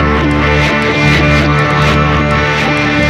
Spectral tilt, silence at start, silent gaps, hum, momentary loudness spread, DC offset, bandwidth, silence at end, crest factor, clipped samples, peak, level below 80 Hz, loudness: -6 dB/octave; 0 s; none; none; 2 LU; under 0.1%; 11.5 kHz; 0 s; 10 dB; under 0.1%; 0 dBFS; -20 dBFS; -10 LUFS